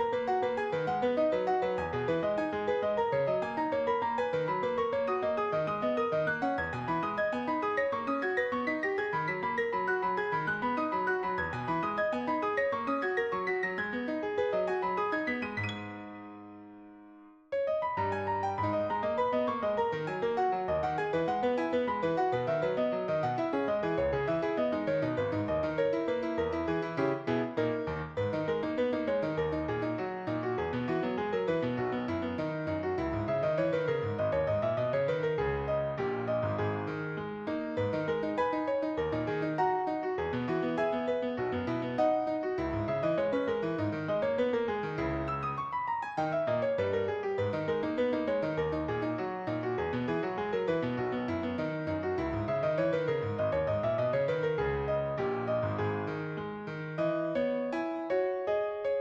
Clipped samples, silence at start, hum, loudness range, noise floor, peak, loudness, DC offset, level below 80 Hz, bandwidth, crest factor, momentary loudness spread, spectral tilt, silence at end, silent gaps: under 0.1%; 0 s; none; 2 LU; -55 dBFS; -16 dBFS; -32 LUFS; under 0.1%; -58 dBFS; 7.8 kHz; 14 dB; 4 LU; -7.5 dB/octave; 0 s; none